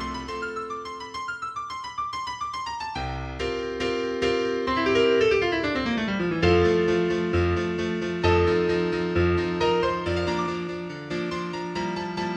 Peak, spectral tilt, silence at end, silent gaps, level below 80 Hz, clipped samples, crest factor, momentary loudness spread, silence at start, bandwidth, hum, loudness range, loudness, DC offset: -8 dBFS; -6 dB/octave; 0 s; none; -44 dBFS; under 0.1%; 16 dB; 11 LU; 0 s; 9.4 kHz; none; 8 LU; -25 LUFS; under 0.1%